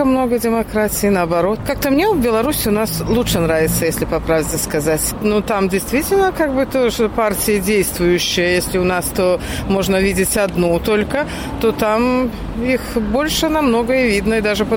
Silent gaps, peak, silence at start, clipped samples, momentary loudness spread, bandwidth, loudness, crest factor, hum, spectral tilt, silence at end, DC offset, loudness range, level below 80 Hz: none; -4 dBFS; 0 s; under 0.1%; 4 LU; 17 kHz; -16 LUFS; 12 dB; none; -4.5 dB/octave; 0 s; under 0.1%; 1 LU; -32 dBFS